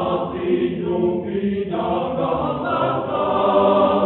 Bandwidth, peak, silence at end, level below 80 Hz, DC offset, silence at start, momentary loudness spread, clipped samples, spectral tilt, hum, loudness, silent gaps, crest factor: 4.2 kHz; -4 dBFS; 0 s; -50 dBFS; under 0.1%; 0 s; 7 LU; under 0.1%; -5.5 dB/octave; none; -20 LUFS; none; 14 dB